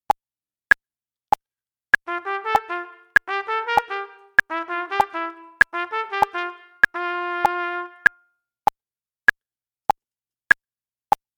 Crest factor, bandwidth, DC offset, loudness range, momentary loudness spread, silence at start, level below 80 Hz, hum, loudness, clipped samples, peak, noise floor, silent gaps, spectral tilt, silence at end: 22 dB; over 20 kHz; under 0.1%; 2 LU; 8 LU; 2.05 s; -58 dBFS; none; -22 LUFS; under 0.1%; -2 dBFS; under -90 dBFS; none; -3 dB/octave; 3.5 s